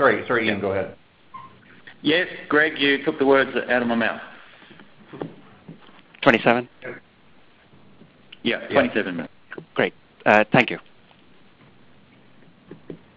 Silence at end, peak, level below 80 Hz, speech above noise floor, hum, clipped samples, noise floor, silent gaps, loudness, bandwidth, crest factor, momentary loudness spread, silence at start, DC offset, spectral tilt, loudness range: 0.2 s; 0 dBFS; -60 dBFS; 34 dB; none; under 0.1%; -54 dBFS; none; -21 LUFS; 7.6 kHz; 24 dB; 20 LU; 0 s; under 0.1%; -6.5 dB/octave; 4 LU